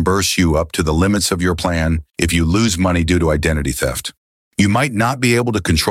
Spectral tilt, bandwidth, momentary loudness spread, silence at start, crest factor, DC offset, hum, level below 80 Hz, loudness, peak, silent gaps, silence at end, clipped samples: -4.5 dB/octave; 16.5 kHz; 5 LU; 0 s; 14 dB; under 0.1%; none; -28 dBFS; -16 LUFS; -2 dBFS; 4.17-4.51 s; 0 s; under 0.1%